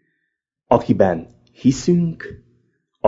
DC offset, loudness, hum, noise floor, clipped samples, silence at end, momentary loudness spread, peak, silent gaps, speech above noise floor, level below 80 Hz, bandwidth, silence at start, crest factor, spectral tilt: under 0.1%; -19 LUFS; none; -76 dBFS; under 0.1%; 0.7 s; 13 LU; 0 dBFS; none; 58 dB; -48 dBFS; 7.8 kHz; 0.7 s; 20 dB; -7 dB/octave